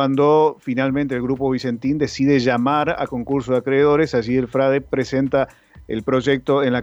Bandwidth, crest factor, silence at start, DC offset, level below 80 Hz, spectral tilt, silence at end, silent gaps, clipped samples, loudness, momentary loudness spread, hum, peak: 8 kHz; 12 dB; 0 s; under 0.1%; -48 dBFS; -7 dB/octave; 0 s; none; under 0.1%; -19 LUFS; 6 LU; none; -6 dBFS